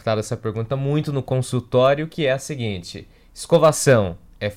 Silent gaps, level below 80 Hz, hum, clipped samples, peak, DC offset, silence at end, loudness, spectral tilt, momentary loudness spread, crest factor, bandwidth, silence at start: none; -50 dBFS; none; under 0.1%; -4 dBFS; under 0.1%; 0 s; -20 LUFS; -5.5 dB/octave; 13 LU; 16 dB; 15.5 kHz; 0.05 s